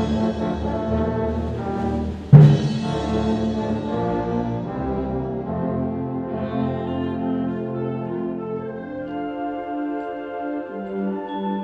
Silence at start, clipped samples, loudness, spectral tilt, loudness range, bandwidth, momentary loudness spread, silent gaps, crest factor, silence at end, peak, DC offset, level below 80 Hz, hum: 0 s; under 0.1%; -23 LUFS; -9 dB/octave; 9 LU; 7.2 kHz; 7 LU; none; 22 dB; 0 s; 0 dBFS; under 0.1%; -38 dBFS; none